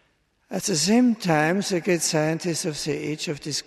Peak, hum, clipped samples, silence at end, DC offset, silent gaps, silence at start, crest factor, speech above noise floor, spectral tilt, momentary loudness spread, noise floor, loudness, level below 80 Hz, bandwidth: -6 dBFS; none; under 0.1%; 0.05 s; under 0.1%; none; 0.5 s; 16 dB; 43 dB; -4 dB/octave; 9 LU; -66 dBFS; -23 LUFS; -60 dBFS; 13.5 kHz